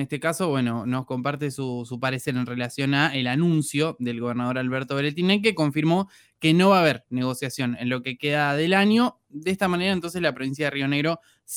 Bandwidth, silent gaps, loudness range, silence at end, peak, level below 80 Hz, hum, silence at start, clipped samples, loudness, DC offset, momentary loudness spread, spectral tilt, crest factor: 19 kHz; none; 3 LU; 0 s; -6 dBFS; -64 dBFS; none; 0 s; under 0.1%; -24 LUFS; under 0.1%; 9 LU; -5.5 dB/octave; 16 dB